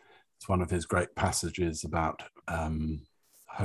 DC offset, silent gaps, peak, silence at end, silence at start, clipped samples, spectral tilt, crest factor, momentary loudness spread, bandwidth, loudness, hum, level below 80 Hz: under 0.1%; none; -14 dBFS; 0 s; 0.4 s; under 0.1%; -5 dB/octave; 20 dB; 13 LU; 13.5 kHz; -32 LUFS; none; -42 dBFS